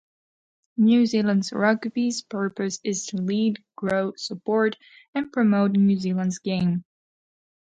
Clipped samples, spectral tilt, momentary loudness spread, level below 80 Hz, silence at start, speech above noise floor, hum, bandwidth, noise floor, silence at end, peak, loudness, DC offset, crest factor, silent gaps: under 0.1%; -5.5 dB/octave; 11 LU; -64 dBFS; 0.8 s; over 67 dB; none; 9 kHz; under -90 dBFS; 0.9 s; -8 dBFS; -24 LUFS; under 0.1%; 16 dB; 5.08-5.13 s